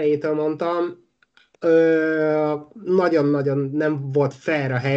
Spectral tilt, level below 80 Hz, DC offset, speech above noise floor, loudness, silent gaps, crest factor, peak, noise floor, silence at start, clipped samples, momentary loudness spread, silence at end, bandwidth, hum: -8 dB/octave; -70 dBFS; under 0.1%; 39 dB; -21 LUFS; none; 14 dB; -6 dBFS; -59 dBFS; 0 s; under 0.1%; 8 LU; 0 s; 7.6 kHz; none